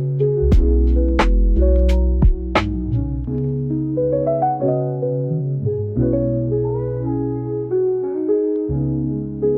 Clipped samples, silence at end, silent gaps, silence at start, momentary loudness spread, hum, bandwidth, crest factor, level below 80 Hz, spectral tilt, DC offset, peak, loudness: under 0.1%; 0 s; none; 0 s; 6 LU; none; 6.6 kHz; 14 dB; -20 dBFS; -9 dB/octave; under 0.1%; -4 dBFS; -19 LUFS